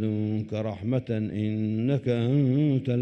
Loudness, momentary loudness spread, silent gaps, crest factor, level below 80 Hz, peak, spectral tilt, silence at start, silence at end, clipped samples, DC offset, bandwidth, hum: -27 LUFS; 7 LU; none; 12 dB; -62 dBFS; -12 dBFS; -10 dB/octave; 0 s; 0 s; under 0.1%; under 0.1%; 6.4 kHz; none